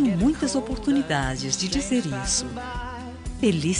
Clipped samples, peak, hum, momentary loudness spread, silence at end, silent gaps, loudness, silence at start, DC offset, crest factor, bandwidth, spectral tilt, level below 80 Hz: under 0.1%; -6 dBFS; none; 11 LU; 0 s; none; -25 LUFS; 0 s; under 0.1%; 18 dB; 10.5 kHz; -4 dB/octave; -38 dBFS